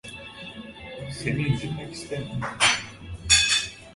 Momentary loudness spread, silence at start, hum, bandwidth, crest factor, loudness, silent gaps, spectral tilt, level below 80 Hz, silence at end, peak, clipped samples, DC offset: 21 LU; 0.05 s; none; 11.5 kHz; 22 dB; -23 LUFS; none; -2 dB/octave; -46 dBFS; 0 s; -4 dBFS; under 0.1%; under 0.1%